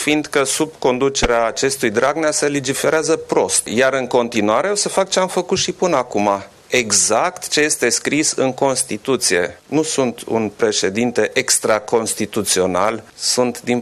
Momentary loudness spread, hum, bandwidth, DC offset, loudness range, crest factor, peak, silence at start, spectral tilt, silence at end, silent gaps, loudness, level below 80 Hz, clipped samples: 5 LU; none; 15 kHz; under 0.1%; 1 LU; 16 dB; -2 dBFS; 0 s; -2.5 dB/octave; 0 s; none; -17 LUFS; -44 dBFS; under 0.1%